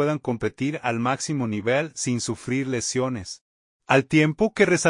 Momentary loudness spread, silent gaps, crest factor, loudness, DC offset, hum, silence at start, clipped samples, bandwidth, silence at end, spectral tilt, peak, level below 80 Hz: 8 LU; 3.41-3.80 s; 20 dB; -24 LUFS; under 0.1%; none; 0 s; under 0.1%; 11 kHz; 0 s; -5 dB/octave; -2 dBFS; -58 dBFS